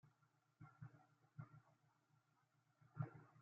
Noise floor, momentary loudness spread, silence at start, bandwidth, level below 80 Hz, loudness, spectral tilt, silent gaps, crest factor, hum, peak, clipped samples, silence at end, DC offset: -83 dBFS; 14 LU; 0.05 s; 5.4 kHz; under -90 dBFS; -59 LUFS; -9 dB/octave; none; 26 dB; none; -34 dBFS; under 0.1%; 0 s; under 0.1%